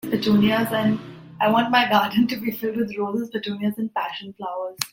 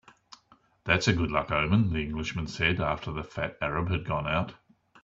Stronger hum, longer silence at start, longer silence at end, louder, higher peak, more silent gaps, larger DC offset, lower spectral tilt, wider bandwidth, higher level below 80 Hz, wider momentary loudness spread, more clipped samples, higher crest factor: neither; second, 0.05 s vs 0.3 s; second, 0.05 s vs 0.5 s; first, -22 LUFS vs -28 LUFS; first, 0 dBFS vs -8 dBFS; neither; neither; about the same, -5 dB/octave vs -5.5 dB/octave; first, 17 kHz vs 7.8 kHz; second, -60 dBFS vs -46 dBFS; first, 12 LU vs 9 LU; neither; about the same, 22 dB vs 22 dB